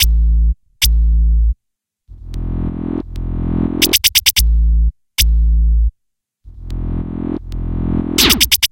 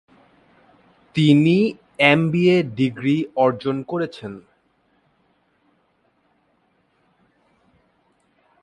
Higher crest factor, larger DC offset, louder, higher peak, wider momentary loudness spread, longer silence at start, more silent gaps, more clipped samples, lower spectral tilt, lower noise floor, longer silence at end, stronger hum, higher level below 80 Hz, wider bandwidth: second, 14 dB vs 22 dB; neither; first, -15 LUFS vs -19 LUFS; about the same, 0 dBFS vs 0 dBFS; about the same, 15 LU vs 13 LU; second, 0 s vs 1.15 s; neither; neither; second, -3 dB/octave vs -7.5 dB/octave; first, -75 dBFS vs -65 dBFS; second, 0.05 s vs 4.2 s; neither; first, -16 dBFS vs -62 dBFS; first, 17.5 kHz vs 11.5 kHz